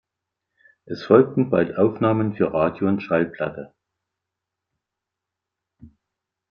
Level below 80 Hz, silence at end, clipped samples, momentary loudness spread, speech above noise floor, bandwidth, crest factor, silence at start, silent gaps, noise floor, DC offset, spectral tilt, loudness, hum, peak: -60 dBFS; 0.65 s; under 0.1%; 13 LU; 65 dB; 6.4 kHz; 22 dB; 0.9 s; none; -85 dBFS; under 0.1%; -9.5 dB/octave; -20 LUFS; none; -2 dBFS